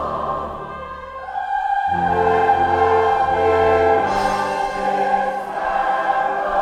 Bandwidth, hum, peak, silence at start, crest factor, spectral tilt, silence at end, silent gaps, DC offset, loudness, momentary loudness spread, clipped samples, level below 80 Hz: 11.5 kHz; none; -4 dBFS; 0 s; 14 dB; -5.5 dB/octave; 0 s; none; under 0.1%; -18 LUFS; 13 LU; under 0.1%; -44 dBFS